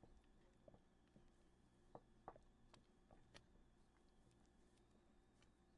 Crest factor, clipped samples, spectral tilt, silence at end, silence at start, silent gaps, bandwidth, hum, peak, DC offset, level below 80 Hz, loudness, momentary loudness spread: 30 dB; under 0.1%; -5 dB/octave; 0 s; 0 s; none; 10 kHz; 60 Hz at -85 dBFS; -40 dBFS; under 0.1%; -76 dBFS; -67 LUFS; 5 LU